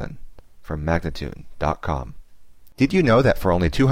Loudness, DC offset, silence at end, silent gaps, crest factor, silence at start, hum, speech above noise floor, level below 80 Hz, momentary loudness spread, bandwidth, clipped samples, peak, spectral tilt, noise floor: -21 LUFS; 0.8%; 0 s; none; 14 dB; 0 s; none; 28 dB; -34 dBFS; 17 LU; 16 kHz; under 0.1%; -6 dBFS; -7 dB/octave; -48 dBFS